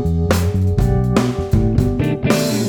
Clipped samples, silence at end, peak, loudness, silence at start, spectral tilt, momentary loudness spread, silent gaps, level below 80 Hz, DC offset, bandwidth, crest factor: under 0.1%; 0 s; -2 dBFS; -17 LUFS; 0 s; -6.5 dB/octave; 2 LU; none; -24 dBFS; under 0.1%; 19.5 kHz; 14 dB